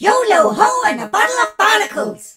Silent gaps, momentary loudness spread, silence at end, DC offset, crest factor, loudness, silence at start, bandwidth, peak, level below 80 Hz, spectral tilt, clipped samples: none; 5 LU; 0.05 s; under 0.1%; 14 dB; -14 LUFS; 0 s; 16.5 kHz; 0 dBFS; -62 dBFS; -2 dB/octave; under 0.1%